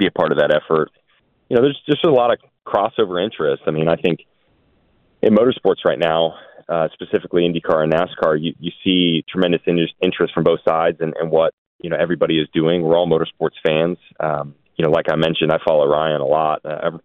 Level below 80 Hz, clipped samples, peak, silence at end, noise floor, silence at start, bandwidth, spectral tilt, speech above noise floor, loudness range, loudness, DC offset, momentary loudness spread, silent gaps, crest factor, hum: -54 dBFS; under 0.1%; -2 dBFS; 0.05 s; -61 dBFS; 0 s; 5.2 kHz; -8 dB/octave; 44 dB; 1 LU; -18 LUFS; under 0.1%; 7 LU; 11.53-11.79 s; 16 dB; none